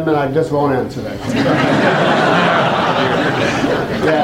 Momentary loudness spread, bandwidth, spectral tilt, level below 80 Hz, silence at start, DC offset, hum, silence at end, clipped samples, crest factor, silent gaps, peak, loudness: 5 LU; 16.5 kHz; -6 dB/octave; -44 dBFS; 0 s; under 0.1%; none; 0 s; under 0.1%; 12 dB; none; -2 dBFS; -15 LUFS